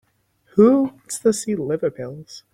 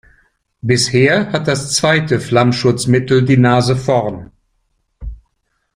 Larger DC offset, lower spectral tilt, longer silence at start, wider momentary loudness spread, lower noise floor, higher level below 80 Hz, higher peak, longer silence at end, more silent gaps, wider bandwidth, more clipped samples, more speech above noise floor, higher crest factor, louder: neither; about the same, -6 dB/octave vs -5 dB/octave; about the same, 0.55 s vs 0.65 s; about the same, 18 LU vs 20 LU; second, -61 dBFS vs -67 dBFS; second, -60 dBFS vs -40 dBFS; about the same, -2 dBFS vs 0 dBFS; second, 0.15 s vs 0.6 s; neither; about the same, 15.5 kHz vs 15 kHz; neither; second, 42 dB vs 54 dB; about the same, 18 dB vs 14 dB; second, -20 LUFS vs -14 LUFS